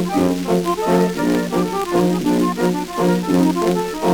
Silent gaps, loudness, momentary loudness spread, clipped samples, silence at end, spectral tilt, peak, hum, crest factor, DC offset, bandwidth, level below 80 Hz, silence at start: none; -18 LUFS; 3 LU; under 0.1%; 0 s; -6.5 dB/octave; -2 dBFS; none; 14 dB; under 0.1%; over 20 kHz; -44 dBFS; 0 s